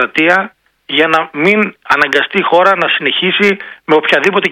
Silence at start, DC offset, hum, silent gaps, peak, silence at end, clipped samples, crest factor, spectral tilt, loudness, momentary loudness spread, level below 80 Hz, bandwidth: 0 s; under 0.1%; none; none; 0 dBFS; 0 s; 0.5%; 12 dB; -4.5 dB/octave; -11 LUFS; 4 LU; -56 dBFS; 15.5 kHz